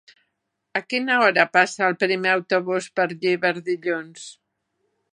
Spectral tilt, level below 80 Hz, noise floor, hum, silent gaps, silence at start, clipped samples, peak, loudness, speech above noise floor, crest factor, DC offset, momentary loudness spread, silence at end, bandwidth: -4 dB/octave; -78 dBFS; -77 dBFS; none; none; 0.75 s; under 0.1%; -2 dBFS; -21 LUFS; 55 dB; 22 dB; under 0.1%; 12 LU; 0.85 s; 11 kHz